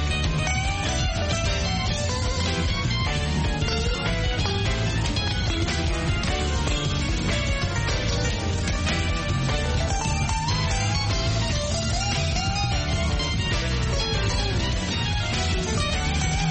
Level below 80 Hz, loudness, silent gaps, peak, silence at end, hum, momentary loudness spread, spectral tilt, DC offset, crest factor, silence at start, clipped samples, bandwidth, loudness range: -30 dBFS; -24 LUFS; none; -10 dBFS; 0 s; none; 1 LU; -4 dB/octave; under 0.1%; 14 dB; 0 s; under 0.1%; 8.8 kHz; 1 LU